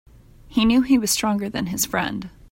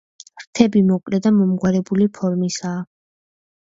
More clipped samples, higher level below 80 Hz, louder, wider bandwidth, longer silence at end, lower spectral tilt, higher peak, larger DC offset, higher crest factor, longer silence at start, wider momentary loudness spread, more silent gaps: neither; first, -44 dBFS vs -56 dBFS; second, -21 LUFS vs -18 LUFS; first, 16.5 kHz vs 7.8 kHz; second, 0.25 s vs 0.95 s; second, -3.5 dB/octave vs -6.5 dB/octave; second, -6 dBFS vs 0 dBFS; neither; about the same, 16 dB vs 18 dB; first, 0.5 s vs 0.35 s; second, 9 LU vs 13 LU; second, none vs 0.47-0.53 s